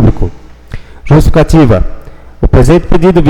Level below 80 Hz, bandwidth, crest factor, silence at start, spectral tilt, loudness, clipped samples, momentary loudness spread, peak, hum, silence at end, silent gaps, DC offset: -14 dBFS; 13.5 kHz; 6 dB; 0 s; -8 dB/octave; -8 LUFS; 0.7%; 22 LU; 0 dBFS; none; 0 s; none; under 0.1%